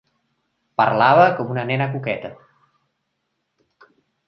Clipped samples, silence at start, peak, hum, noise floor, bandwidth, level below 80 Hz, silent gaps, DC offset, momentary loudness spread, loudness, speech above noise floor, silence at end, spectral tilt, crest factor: under 0.1%; 0.8 s; -2 dBFS; none; -74 dBFS; 6.2 kHz; -66 dBFS; none; under 0.1%; 15 LU; -18 LUFS; 57 dB; 1.95 s; -8 dB/octave; 20 dB